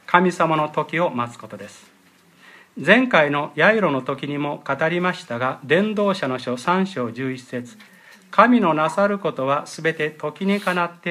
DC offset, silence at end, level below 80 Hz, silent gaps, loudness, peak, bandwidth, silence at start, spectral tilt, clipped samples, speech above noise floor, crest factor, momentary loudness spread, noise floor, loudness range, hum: under 0.1%; 0 s; -72 dBFS; none; -20 LUFS; 0 dBFS; 14.5 kHz; 0.1 s; -6 dB/octave; under 0.1%; 33 dB; 20 dB; 13 LU; -53 dBFS; 3 LU; none